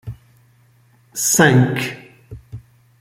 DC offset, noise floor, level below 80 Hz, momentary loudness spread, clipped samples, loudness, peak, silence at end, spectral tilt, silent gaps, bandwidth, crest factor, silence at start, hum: under 0.1%; -54 dBFS; -50 dBFS; 26 LU; under 0.1%; -15 LUFS; -2 dBFS; 0.4 s; -4 dB/octave; none; 16.5 kHz; 18 dB; 0.05 s; none